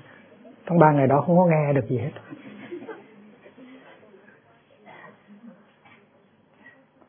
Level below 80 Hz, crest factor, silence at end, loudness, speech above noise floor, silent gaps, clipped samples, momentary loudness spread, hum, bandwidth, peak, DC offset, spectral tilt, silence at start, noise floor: -68 dBFS; 26 dB; 1.6 s; -20 LUFS; 40 dB; none; under 0.1%; 25 LU; none; 3.6 kHz; 0 dBFS; under 0.1%; -12.5 dB/octave; 0.65 s; -59 dBFS